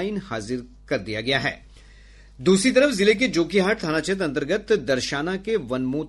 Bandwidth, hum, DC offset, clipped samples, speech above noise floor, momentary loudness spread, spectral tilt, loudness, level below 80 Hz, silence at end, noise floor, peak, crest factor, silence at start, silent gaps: 11.5 kHz; none; under 0.1%; under 0.1%; 25 dB; 11 LU; -4.5 dB/octave; -22 LUFS; -48 dBFS; 0 s; -48 dBFS; -6 dBFS; 18 dB; 0 s; none